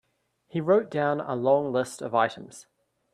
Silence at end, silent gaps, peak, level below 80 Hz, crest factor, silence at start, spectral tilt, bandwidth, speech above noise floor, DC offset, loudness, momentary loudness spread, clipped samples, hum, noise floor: 0.5 s; none; -8 dBFS; -72 dBFS; 18 dB; 0.55 s; -6 dB/octave; 13 kHz; 44 dB; under 0.1%; -26 LUFS; 11 LU; under 0.1%; none; -70 dBFS